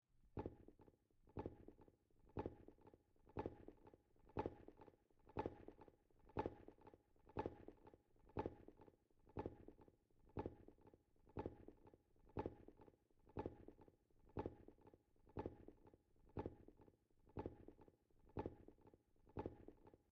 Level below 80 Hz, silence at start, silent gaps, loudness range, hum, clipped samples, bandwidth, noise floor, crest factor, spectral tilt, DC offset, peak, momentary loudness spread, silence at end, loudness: -70 dBFS; 0.15 s; none; 3 LU; none; under 0.1%; 6.2 kHz; -74 dBFS; 26 dB; -7.5 dB/octave; under 0.1%; -32 dBFS; 15 LU; 0.15 s; -55 LUFS